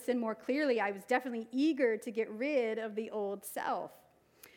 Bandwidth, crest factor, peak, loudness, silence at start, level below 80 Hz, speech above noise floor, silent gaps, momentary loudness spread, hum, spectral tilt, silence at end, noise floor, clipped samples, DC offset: 19 kHz; 18 dB; -16 dBFS; -34 LUFS; 0 s; -84 dBFS; 27 dB; none; 8 LU; none; -4.5 dB/octave; 0.1 s; -61 dBFS; under 0.1%; under 0.1%